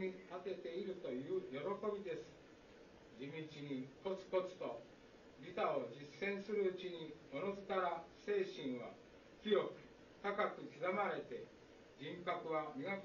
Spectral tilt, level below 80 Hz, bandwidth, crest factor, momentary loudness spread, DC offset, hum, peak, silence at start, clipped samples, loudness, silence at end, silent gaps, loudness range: -4 dB/octave; -78 dBFS; 7.2 kHz; 20 dB; 21 LU; under 0.1%; none; -24 dBFS; 0 s; under 0.1%; -44 LUFS; 0 s; none; 4 LU